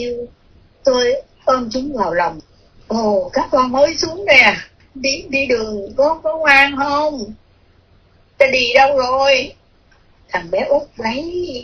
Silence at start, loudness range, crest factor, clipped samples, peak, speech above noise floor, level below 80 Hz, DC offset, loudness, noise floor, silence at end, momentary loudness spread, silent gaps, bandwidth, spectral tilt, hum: 0 s; 4 LU; 16 dB; under 0.1%; 0 dBFS; 36 dB; -46 dBFS; under 0.1%; -15 LUFS; -51 dBFS; 0 s; 14 LU; none; 5.4 kHz; -3 dB/octave; none